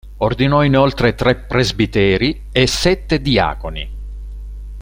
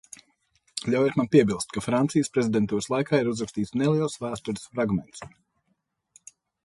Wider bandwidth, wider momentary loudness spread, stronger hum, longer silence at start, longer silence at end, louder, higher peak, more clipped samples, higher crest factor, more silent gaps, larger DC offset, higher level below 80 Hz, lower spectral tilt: first, 16.5 kHz vs 11.5 kHz; first, 19 LU vs 12 LU; first, 50 Hz at -30 dBFS vs none; second, 0.05 s vs 0.75 s; second, 0 s vs 1.4 s; first, -15 LUFS vs -25 LUFS; first, -2 dBFS vs -6 dBFS; neither; about the same, 16 dB vs 20 dB; neither; neither; first, -28 dBFS vs -58 dBFS; about the same, -5.5 dB/octave vs -6 dB/octave